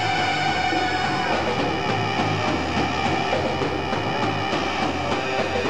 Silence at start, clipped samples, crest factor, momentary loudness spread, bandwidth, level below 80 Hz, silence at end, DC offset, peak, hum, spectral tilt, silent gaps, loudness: 0 s; under 0.1%; 12 dB; 3 LU; 13.5 kHz; -46 dBFS; 0 s; 1%; -10 dBFS; none; -5 dB/octave; none; -23 LUFS